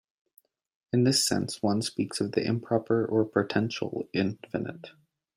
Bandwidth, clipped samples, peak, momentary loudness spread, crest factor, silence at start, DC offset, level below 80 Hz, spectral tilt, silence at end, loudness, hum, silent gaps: 16 kHz; under 0.1%; -10 dBFS; 11 LU; 20 dB; 0.95 s; under 0.1%; -68 dBFS; -4.5 dB/octave; 0.45 s; -28 LUFS; none; none